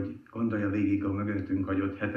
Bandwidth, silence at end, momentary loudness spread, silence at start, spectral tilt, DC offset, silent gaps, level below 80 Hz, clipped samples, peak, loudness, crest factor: 5.6 kHz; 0 s; 4 LU; 0 s; -10 dB/octave; under 0.1%; none; -64 dBFS; under 0.1%; -16 dBFS; -30 LUFS; 14 dB